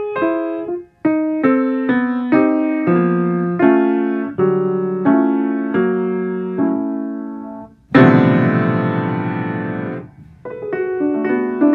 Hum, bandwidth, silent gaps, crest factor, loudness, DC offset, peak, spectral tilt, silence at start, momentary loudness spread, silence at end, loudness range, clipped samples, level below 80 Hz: none; 4.6 kHz; none; 16 dB; -17 LUFS; under 0.1%; 0 dBFS; -10.5 dB/octave; 0 s; 12 LU; 0 s; 3 LU; under 0.1%; -56 dBFS